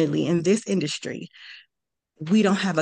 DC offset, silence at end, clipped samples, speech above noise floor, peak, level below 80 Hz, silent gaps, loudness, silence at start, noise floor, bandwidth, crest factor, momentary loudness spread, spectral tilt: under 0.1%; 0 s; under 0.1%; 61 dB; -8 dBFS; -68 dBFS; none; -23 LUFS; 0 s; -84 dBFS; 10 kHz; 16 dB; 20 LU; -5.5 dB/octave